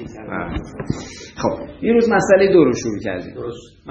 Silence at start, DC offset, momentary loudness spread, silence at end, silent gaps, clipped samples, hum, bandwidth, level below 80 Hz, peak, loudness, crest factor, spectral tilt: 0 s; under 0.1%; 17 LU; 0 s; none; under 0.1%; none; 8.2 kHz; -42 dBFS; -2 dBFS; -18 LUFS; 16 dB; -6 dB/octave